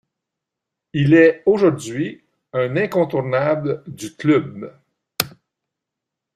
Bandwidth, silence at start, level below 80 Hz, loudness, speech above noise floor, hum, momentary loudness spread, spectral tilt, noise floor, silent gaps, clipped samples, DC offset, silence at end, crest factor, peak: 15 kHz; 0.95 s; -58 dBFS; -19 LUFS; 66 dB; none; 18 LU; -6.5 dB/octave; -83 dBFS; none; under 0.1%; under 0.1%; 1.1 s; 20 dB; 0 dBFS